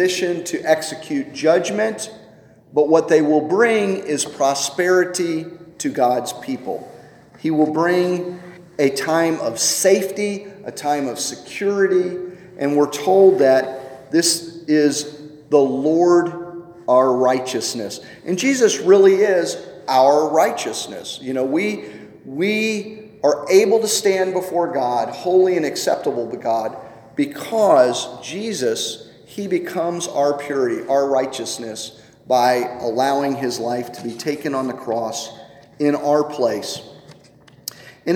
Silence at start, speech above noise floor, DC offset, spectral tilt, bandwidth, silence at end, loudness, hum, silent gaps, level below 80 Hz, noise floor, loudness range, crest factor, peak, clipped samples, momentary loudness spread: 0 s; 30 dB; under 0.1%; -4 dB/octave; 17.5 kHz; 0 s; -19 LUFS; none; none; -66 dBFS; -48 dBFS; 5 LU; 18 dB; -2 dBFS; under 0.1%; 15 LU